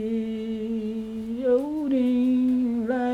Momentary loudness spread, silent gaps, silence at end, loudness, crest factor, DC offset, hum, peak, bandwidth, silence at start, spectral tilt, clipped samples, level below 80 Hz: 9 LU; none; 0 s; -25 LUFS; 12 dB; under 0.1%; none; -12 dBFS; 5 kHz; 0 s; -7.5 dB/octave; under 0.1%; -56 dBFS